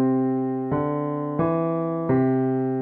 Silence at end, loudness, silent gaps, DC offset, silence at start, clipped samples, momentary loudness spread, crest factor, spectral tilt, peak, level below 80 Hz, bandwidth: 0 s; -24 LUFS; none; under 0.1%; 0 s; under 0.1%; 4 LU; 14 dB; -12.5 dB/octave; -10 dBFS; -54 dBFS; 3.6 kHz